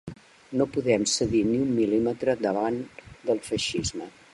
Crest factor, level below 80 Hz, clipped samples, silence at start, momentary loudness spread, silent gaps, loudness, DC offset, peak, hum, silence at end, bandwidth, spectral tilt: 18 dB; -52 dBFS; under 0.1%; 0.05 s; 11 LU; none; -26 LUFS; under 0.1%; -8 dBFS; none; 0.25 s; 11.5 kHz; -4.5 dB/octave